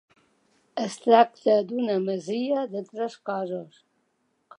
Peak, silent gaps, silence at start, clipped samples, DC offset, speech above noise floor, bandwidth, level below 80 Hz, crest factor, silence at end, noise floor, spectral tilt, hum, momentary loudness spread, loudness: -4 dBFS; none; 0.75 s; under 0.1%; under 0.1%; 48 dB; 10.5 kHz; -84 dBFS; 22 dB; 0.95 s; -72 dBFS; -5.5 dB/octave; none; 14 LU; -25 LUFS